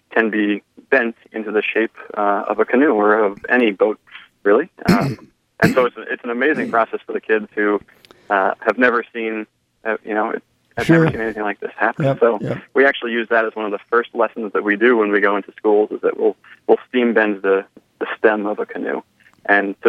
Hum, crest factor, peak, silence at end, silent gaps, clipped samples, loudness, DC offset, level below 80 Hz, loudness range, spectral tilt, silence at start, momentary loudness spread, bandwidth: none; 18 dB; 0 dBFS; 0 s; none; under 0.1%; -18 LUFS; under 0.1%; -54 dBFS; 3 LU; -7 dB/octave; 0.1 s; 10 LU; 13.5 kHz